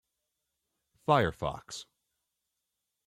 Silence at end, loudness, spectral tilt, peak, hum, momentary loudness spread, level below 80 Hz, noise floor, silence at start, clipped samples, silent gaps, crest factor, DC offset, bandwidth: 1.25 s; -30 LUFS; -5.5 dB/octave; -10 dBFS; none; 17 LU; -60 dBFS; -85 dBFS; 1.1 s; under 0.1%; none; 24 dB; under 0.1%; 16 kHz